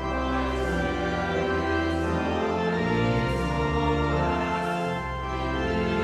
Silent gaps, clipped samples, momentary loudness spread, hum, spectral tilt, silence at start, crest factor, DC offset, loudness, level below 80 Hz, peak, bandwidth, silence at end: none; under 0.1%; 3 LU; none; -6.5 dB/octave; 0 s; 12 dB; under 0.1%; -26 LUFS; -36 dBFS; -14 dBFS; 13 kHz; 0 s